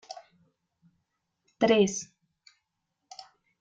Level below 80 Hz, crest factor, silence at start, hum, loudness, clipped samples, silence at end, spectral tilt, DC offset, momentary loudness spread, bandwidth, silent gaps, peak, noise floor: -70 dBFS; 22 dB; 0.1 s; none; -26 LUFS; under 0.1%; 0.4 s; -4 dB/octave; under 0.1%; 25 LU; 9.2 kHz; none; -10 dBFS; -82 dBFS